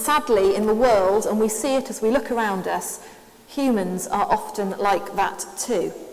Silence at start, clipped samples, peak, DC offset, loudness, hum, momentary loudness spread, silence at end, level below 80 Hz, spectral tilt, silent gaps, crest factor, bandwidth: 0 s; under 0.1%; -6 dBFS; under 0.1%; -22 LUFS; none; 9 LU; 0 s; -52 dBFS; -4 dB/octave; none; 16 dB; 16 kHz